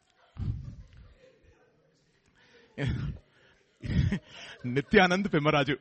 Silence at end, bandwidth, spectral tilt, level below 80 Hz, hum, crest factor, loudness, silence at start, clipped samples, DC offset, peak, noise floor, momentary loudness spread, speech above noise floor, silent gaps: 0.05 s; 8.4 kHz; -6.5 dB/octave; -46 dBFS; none; 24 dB; -28 LUFS; 0.35 s; under 0.1%; under 0.1%; -6 dBFS; -68 dBFS; 22 LU; 40 dB; none